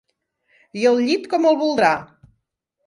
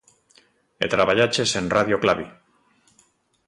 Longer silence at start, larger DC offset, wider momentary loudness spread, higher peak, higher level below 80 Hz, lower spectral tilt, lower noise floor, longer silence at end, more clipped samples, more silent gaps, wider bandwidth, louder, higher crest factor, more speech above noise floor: about the same, 0.75 s vs 0.8 s; neither; second, 6 LU vs 9 LU; about the same, -4 dBFS vs -4 dBFS; second, -64 dBFS vs -54 dBFS; about the same, -4.5 dB/octave vs -3.5 dB/octave; first, -75 dBFS vs -62 dBFS; second, 0.8 s vs 1.15 s; neither; neither; about the same, 11.5 kHz vs 11.5 kHz; first, -18 LUFS vs -21 LUFS; about the same, 18 dB vs 20 dB; first, 57 dB vs 42 dB